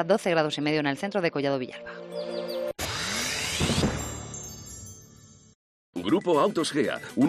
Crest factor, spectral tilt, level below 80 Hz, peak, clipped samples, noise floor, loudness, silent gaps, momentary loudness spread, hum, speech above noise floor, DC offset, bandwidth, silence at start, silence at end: 18 dB; -4 dB/octave; -50 dBFS; -8 dBFS; under 0.1%; -52 dBFS; -27 LUFS; 5.55-5.93 s; 16 LU; none; 27 dB; under 0.1%; 14.5 kHz; 0 s; 0 s